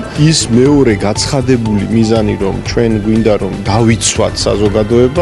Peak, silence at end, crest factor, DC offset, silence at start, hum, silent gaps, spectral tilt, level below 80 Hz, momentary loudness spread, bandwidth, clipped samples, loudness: 0 dBFS; 0 s; 10 dB; under 0.1%; 0 s; none; none; -5.5 dB/octave; -28 dBFS; 5 LU; 12 kHz; under 0.1%; -11 LUFS